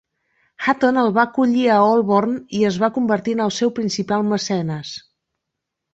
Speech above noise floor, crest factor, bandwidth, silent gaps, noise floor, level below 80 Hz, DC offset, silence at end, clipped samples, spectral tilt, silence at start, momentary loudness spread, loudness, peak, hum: 62 dB; 16 dB; 8 kHz; none; -80 dBFS; -62 dBFS; under 0.1%; 0.95 s; under 0.1%; -5.5 dB/octave; 0.6 s; 8 LU; -18 LUFS; -2 dBFS; none